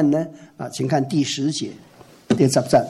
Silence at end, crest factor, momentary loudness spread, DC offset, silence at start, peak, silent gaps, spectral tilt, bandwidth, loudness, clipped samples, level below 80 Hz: 0 s; 16 dB; 15 LU; under 0.1%; 0 s; -4 dBFS; none; -5.5 dB/octave; 13.5 kHz; -21 LUFS; under 0.1%; -58 dBFS